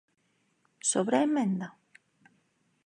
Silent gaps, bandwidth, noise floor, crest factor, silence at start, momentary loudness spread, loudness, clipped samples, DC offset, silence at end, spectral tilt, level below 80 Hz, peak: none; 11 kHz; -72 dBFS; 20 dB; 0.85 s; 9 LU; -28 LUFS; under 0.1%; under 0.1%; 1.2 s; -4.5 dB/octave; -84 dBFS; -12 dBFS